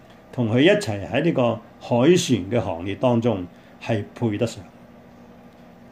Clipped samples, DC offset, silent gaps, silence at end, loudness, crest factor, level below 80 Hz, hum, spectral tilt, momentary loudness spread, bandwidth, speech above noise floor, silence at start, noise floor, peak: under 0.1%; under 0.1%; none; 1.25 s; -22 LUFS; 18 dB; -58 dBFS; none; -6 dB/octave; 14 LU; 15 kHz; 26 dB; 0.35 s; -46 dBFS; -4 dBFS